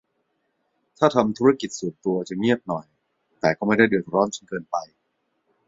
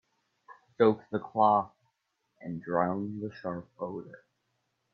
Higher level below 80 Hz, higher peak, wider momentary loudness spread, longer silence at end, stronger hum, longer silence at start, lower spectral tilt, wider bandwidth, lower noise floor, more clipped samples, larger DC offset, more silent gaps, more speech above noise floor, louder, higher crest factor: first, -62 dBFS vs -74 dBFS; first, -2 dBFS vs -10 dBFS; second, 11 LU vs 18 LU; about the same, 0.8 s vs 0.75 s; neither; first, 1 s vs 0.5 s; second, -5.5 dB/octave vs -9.5 dB/octave; first, 7.8 kHz vs 5.8 kHz; second, -73 dBFS vs -79 dBFS; neither; neither; neither; about the same, 51 dB vs 49 dB; first, -23 LUFS vs -30 LUFS; about the same, 22 dB vs 22 dB